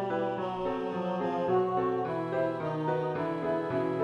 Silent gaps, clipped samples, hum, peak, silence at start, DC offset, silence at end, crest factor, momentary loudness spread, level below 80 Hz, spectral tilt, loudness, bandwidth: none; under 0.1%; none; -18 dBFS; 0 s; under 0.1%; 0 s; 14 dB; 4 LU; -64 dBFS; -8.5 dB/octave; -31 LUFS; 7.4 kHz